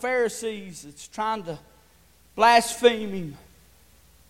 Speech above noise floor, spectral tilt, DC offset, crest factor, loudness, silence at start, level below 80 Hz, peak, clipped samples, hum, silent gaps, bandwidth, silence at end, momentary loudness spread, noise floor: 34 dB; -3 dB/octave; under 0.1%; 22 dB; -23 LUFS; 0 s; -58 dBFS; -4 dBFS; under 0.1%; none; none; 16.5 kHz; 0.95 s; 23 LU; -58 dBFS